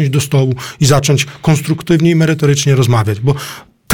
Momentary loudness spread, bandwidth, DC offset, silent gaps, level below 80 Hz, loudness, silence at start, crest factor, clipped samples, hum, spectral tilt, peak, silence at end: 6 LU; 18 kHz; under 0.1%; none; -42 dBFS; -13 LUFS; 0 s; 12 dB; under 0.1%; none; -5.5 dB/octave; 0 dBFS; 0 s